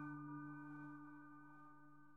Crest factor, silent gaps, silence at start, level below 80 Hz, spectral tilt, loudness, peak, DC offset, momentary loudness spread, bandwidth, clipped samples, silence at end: 14 dB; none; 0 s; under -90 dBFS; -8.5 dB/octave; -56 LUFS; -42 dBFS; under 0.1%; 12 LU; 3.6 kHz; under 0.1%; 0 s